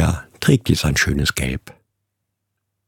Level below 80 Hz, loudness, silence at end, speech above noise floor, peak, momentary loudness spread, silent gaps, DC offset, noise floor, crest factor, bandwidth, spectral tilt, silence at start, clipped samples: -32 dBFS; -19 LUFS; 1.15 s; 59 dB; -2 dBFS; 8 LU; none; under 0.1%; -77 dBFS; 20 dB; 18 kHz; -4.5 dB/octave; 0 s; under 0.1%